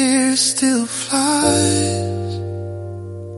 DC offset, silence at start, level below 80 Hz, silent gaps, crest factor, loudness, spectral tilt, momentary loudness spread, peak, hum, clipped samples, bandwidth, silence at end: under 0.1%; 0 s; -52 dBFS; none; 18 dB; -17 LUFS; -3.5 dB/octave; 14 LU; 0 dBFS; none; under 0.1%; 11.5 kHz; 0 s